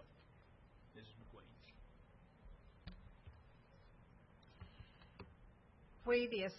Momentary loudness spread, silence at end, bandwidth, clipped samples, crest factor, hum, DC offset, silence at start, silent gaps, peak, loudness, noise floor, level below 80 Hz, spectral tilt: 28 LU; 0 s; 5.8 kHz; under 0.1%; 24 dB; none; under 0.1%; 0 s; none; -24 dBFS; -40 LUFS; -66 dBFS; -66 dBFS; -3.5 dB/octave